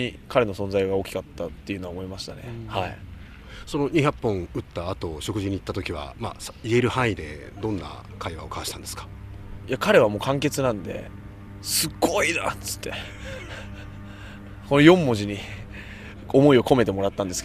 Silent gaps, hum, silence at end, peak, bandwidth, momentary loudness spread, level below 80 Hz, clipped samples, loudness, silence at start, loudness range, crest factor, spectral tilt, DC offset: none; none; 0 s; 0 dBFS; 15 kHz; 22 LU; -46 dBFS; under 0.1%; -24 LUFS; 0 s; 7 LU; 24 dB; -5 dB/octave; under 0.1%